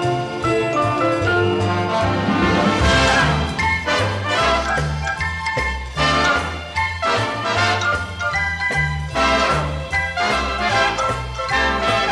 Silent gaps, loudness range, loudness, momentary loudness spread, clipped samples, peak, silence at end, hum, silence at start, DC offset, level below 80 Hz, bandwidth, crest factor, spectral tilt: none; 2 LU; -18 LUFS; 6 LU; under 0.1%; -4 dBFS; 0 s; none; 0 s; under 0.1%; -32 dBFS; 13 kHz; 16 dB; -4.5 dB/octave